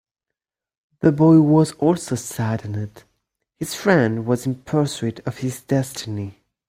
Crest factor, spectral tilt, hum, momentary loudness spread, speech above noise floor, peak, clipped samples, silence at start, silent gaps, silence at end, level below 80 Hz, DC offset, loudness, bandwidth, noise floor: 18 dB; -6.5 dB/octave; none; 16 LU; 66 dB; -2 dBFS; under 0.1%; 1 s; none; 0.4 s; -56 dBFS; under 0.1%; -20 LUFS; 16 kHz; -86 dBFS